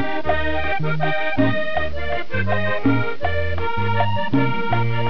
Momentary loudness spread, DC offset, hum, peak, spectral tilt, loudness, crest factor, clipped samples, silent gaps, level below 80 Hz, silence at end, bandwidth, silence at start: 4 LU; 10%; none; -6 dBFS; -8.5 dB/octave; -22 LUFS; 16 dB; under 0.1%; none; -38 dBFS; 0 s; 5.4 kHz; 0 s